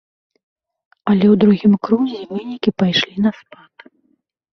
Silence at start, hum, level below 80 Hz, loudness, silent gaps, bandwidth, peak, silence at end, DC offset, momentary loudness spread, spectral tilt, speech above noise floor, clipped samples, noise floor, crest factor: 1.05 s; none; -56 dBFS; -16 LUFS; none; 6.4 kHz; -2 dBFS; 1.2 s; under 0.1%; 12 LU; -7 dB/octave; 49 dB; under 0.1%; -64 dBFS; 16 dB